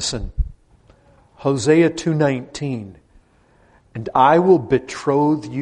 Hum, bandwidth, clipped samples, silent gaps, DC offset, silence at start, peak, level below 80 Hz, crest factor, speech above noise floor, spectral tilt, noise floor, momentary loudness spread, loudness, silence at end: none; 10.5 kHz; under 0.1%; none; under 0.1%; 0 s; -2 dBFS; -36 dBFS; 18 dB; 38 dB; -6 dB/octave; -55 dBFS; 16 LU; -18 LUFS; 0 s